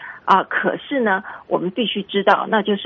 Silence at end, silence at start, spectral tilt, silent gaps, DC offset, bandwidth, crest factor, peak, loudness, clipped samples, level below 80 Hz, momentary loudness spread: 0 s; 0 s; -2.5 dB/octave; none; under 0.1%; 7 kHz; 20 dB; 0 dBFS; -19 LUFS; under 0.1%; -64 dBFS; 7 LU